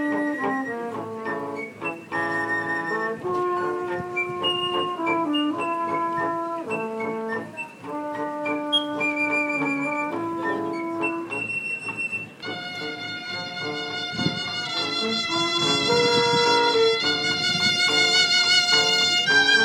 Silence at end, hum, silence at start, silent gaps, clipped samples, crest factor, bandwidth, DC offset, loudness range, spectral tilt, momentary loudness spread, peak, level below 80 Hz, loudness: 0 s; none; 0 s; none; under 0.1%; 18 dB; 18 kHz; under 0.1%; 10 LU; -2.5 dB/octave; 13 LU; -6 dBFS; -66 dBFS; -23 LUFS